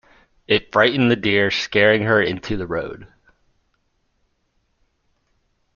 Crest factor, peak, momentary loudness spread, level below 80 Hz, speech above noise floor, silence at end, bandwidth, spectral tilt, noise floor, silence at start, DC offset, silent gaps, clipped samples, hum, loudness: 20 dB; -2 dBFS; 11 LU; -48 dBFS; 49 dB; 2.7 s; 7.2 kHz; -5.5 dB/octave; -68 dBFS; 0.5 s; under 0.1%; none; under 0.1%; none; -18 LUFS